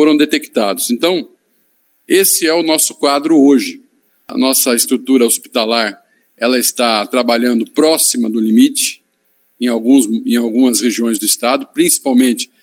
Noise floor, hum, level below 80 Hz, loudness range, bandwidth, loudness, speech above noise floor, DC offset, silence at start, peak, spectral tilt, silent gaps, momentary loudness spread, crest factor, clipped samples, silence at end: -59 dBFS; none; -70 dBFS; 1 LU; 16.5 kHz; -12 LUFS; 47 dB; under 0.1%; 0 s; 0 dBFS; -2.5 dB/octave; none; 6 LU; 14 dB; under 0.1%; 0.15 s